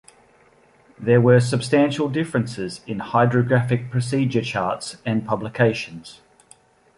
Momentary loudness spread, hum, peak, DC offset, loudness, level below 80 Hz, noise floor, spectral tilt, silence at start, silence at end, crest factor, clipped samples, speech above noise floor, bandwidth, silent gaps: 12 LU; none; -2 dBFS; under 0.1%; -21 LUFS; -56 dBFS; -55 dBFS; -6.5 dB/octave; 1 s; 0.85 s; 18 dB; under 0.1%; 35 dB; 11.5 kHz; none